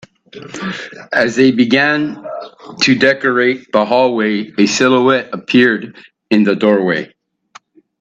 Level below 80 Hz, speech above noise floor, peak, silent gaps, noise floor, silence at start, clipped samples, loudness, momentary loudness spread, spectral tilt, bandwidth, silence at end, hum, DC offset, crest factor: -60 dBFS; 31 dB; 0 dBFS; none; -45 dBFS; 0.35 s; under 0.1%; -13 LUFS; 16 LU; -4.5 dB/octave; 8 kHz; 0.95 s; none; under 0.1%; 14 dB